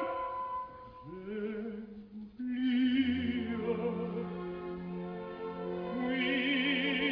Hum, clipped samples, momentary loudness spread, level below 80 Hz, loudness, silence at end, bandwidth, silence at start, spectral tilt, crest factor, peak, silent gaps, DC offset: none; under 0.1%; 16 LU; -62 dBFS; -34 LUFS; 0 s; 5.4 kHz; 0 s; -8 dB/octave; 16 dB; -20 dBFS; none; under 0.1%